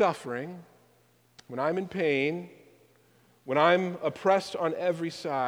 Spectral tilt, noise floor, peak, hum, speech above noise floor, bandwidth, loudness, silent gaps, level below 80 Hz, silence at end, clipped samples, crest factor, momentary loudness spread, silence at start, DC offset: -5.5 dB/octave; -64 dBFS; -8 dBFS; 60 Hz at -65 dBFS; 36 dB; over 20 kHz; -28 LUFS; none; -74 dBFS; 0 s; under 0.1%; 22 dB; 18 LU; 0 s; under 0.1%